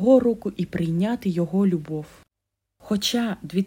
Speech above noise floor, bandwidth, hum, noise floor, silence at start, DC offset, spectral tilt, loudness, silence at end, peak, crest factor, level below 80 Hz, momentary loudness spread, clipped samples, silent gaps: 60 dB; 16.5 kHz; none; -82 dBFS; 0 s; under 0.1%; -6 dB/octave; -24 LUFS; 0 s; -6 dBFS; 18 dB; -54 dBFS; 10 LU; under 0.1%; none